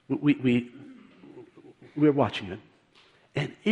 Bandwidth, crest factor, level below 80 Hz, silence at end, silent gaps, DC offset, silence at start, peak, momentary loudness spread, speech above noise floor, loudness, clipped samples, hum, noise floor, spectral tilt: 8.6 kHz; 20 dB; -66 dBFS; 0 s; none; under 0.1%; 0.1 s; -10 dBFS; 20 LU; 35 dB; -26 LUFS; under 0.1%; none; -60 dBFS; -7.5 dB/octave